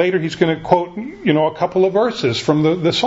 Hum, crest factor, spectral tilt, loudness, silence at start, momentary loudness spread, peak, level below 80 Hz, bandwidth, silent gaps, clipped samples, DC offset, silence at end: none; 16 dB; -6 dB/octave; -17 LUFS; 0 s; 3 LU; 0 dBFS; -52 dBFS; 8 kHz; none; under 0.1%; under 0.1%; 0 s